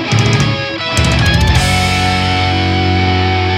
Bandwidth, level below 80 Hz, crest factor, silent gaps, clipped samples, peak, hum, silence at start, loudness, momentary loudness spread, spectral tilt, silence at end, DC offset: 15.5 kHz; -24 dBFS; 12 dB; none; under 0.1%; 0 dBFS; none; 0 s; -12 LUFS; 3 LU; -4.5 dB/octave; 0 s; under 0.1%